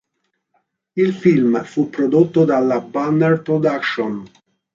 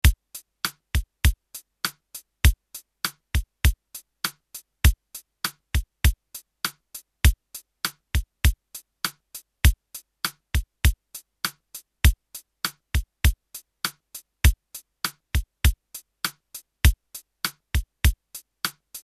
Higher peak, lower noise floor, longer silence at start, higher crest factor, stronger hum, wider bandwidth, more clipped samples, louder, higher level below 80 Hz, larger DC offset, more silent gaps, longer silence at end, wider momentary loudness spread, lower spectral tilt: about the same, -2 dBFS vs -2 dBFS; first, -72 dBFS vs -47 dBFS; first, 0.95 s vs 0.05 s; second, 16 dB vs 22 dB; neither; second, 7.6 kHz vs 14 kHz; neither; first, -17 LUFS vs -26 LUFS; second, -64 dBFS vs -28 dBFS; neither; neither; first, 0.45 s vs 0.05 s; second, 8 LU vs 20 LU; first, -8 dB/octave vs -3.5 dB/octave